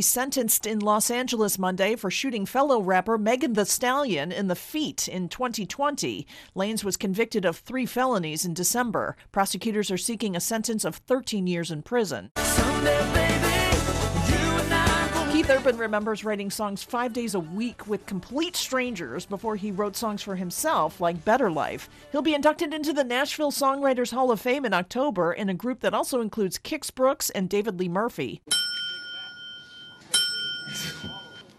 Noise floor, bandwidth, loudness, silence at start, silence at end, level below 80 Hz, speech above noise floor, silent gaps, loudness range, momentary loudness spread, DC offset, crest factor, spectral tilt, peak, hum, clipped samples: -46 dBFS; 14.5 kHz; -26 LUFS; 0 s; 0.15 s; -42 dBFS; 20 dB; 12.31-12.35 s; 5 LU; 9 LU; under 0.1%; 18 dB; -3.5 dB/octave; -8 dBFS; none; under 0.1%